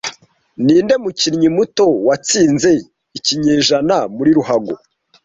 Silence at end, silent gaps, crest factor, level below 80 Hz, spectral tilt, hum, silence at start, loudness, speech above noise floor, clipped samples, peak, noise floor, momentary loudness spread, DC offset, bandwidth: 0.5 s; none; 12 dB; -52 dBFS; -4 dB/octave; none; 0.05 s; -14 LUFS; 21 dB; under 0.1%; -2 dBFS; -35 dBFS; 7 LU; under 0.1%; 8 kHz